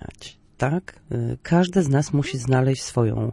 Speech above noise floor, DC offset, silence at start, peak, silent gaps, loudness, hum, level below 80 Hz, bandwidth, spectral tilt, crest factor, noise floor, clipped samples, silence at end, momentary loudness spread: 23 dB; under 0.1%; 0 s; -6 dBFS; none; -22 LUFS; none; -48 dBFS; 11.5 kHz; -6.5 dB/octave; 18 dB; -45 dBFS; under 0.1%; 0 s; 12 LU